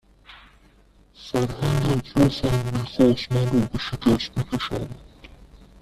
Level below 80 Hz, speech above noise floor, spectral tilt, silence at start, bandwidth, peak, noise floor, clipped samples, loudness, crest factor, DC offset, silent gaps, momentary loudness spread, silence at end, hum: -42 dBFS; 33 dB; -6.5 dB/octave; 0.3 s; 14 kHz; -4 dBFS; -55 dBFS; under 0.1%; -23 LUFS; 20 dB; under 0.1%; none; 10 LU; 0.25 s; none